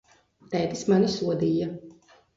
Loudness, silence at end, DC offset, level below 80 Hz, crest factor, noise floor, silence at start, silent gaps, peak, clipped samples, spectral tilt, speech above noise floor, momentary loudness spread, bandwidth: -26 LUFS; 0.45 s; under 0.1%; -60 dBFS; 16 dB; -53 dBFS; 0.5 s; none; -10 dBFS; under 0.1%; -6.5 dB/octave; 29 dB; 11 LU; 7.8 kHz